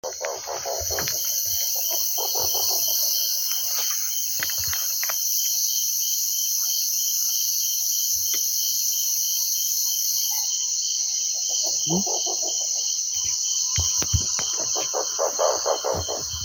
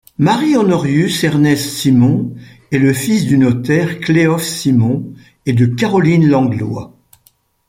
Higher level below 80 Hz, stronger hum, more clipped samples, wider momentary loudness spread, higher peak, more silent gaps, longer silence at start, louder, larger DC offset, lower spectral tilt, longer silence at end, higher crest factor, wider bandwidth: about the same, -48 dBFS vs -50 dBFS; neither; neither; second, 3 LU vs 9 LU; second, -6 dBFS vs 0 dBFS; neither; second, 0.05 s vs 0.2 s; second, -21 LUFS vs -13 LUFS; neither; second, -0.5 dB/octave vs -6 dB/octave; second, 0 s vs 0.8 s; first, 20 dB vs 12 dB; about the same, 17 kHz vs 16 kHz